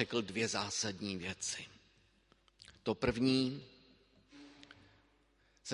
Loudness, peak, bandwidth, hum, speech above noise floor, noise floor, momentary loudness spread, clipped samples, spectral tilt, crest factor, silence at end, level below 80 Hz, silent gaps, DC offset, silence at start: -36 LUFS; -16 dBFS; 11.5 kHz; none; 35 dB; -72 dBFS; 25 LU; under 0.1%; -3.5 dB/octave; 24 dB; 0 s; -62 dBFS; none; under 0.1%; 0 s